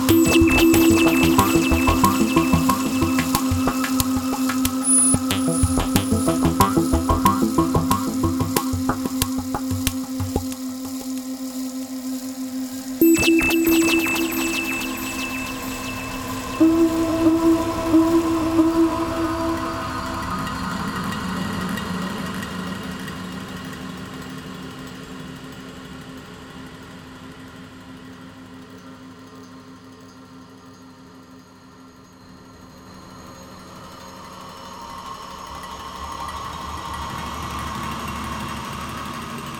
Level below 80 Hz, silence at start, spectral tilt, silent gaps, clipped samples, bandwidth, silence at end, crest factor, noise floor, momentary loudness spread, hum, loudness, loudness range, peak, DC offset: -38 dBFS; 0 s; -4.5 dB/octave; none; under 0.1%; 19.5 kHz; 0 s; 22 dB; -45 dBFS; 23 LU; none; -21 LUFS; 21 LU; 0 dBFS; under 0.1%